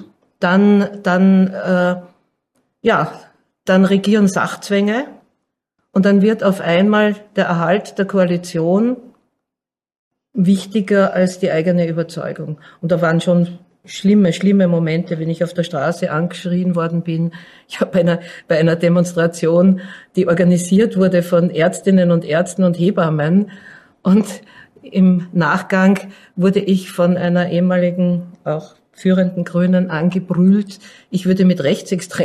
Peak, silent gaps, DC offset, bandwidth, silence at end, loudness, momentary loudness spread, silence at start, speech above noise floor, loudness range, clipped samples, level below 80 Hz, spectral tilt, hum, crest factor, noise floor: -2 dBFS; 9.99-10.11 s; under 0.1%; 12.5 kHz; 0 s; -16 LUFS; 10 LU; 0 s; 71 dB; 3 LU; under 0.1%; -60 dBFS; -7 dB/octave; none; 12 dB; -86 dBFS